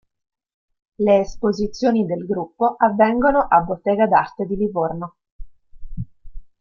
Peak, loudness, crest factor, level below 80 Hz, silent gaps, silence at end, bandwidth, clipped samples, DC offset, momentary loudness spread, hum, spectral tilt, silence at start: -2 dBFS; -19 LUFS; 18 dB; -42 dBFS; 5.32-5.39 s; 0.15 s; 7.2 kHz; under 0.1%; under 0.1%; 18 LU; none; -7 dB/octave; 1 s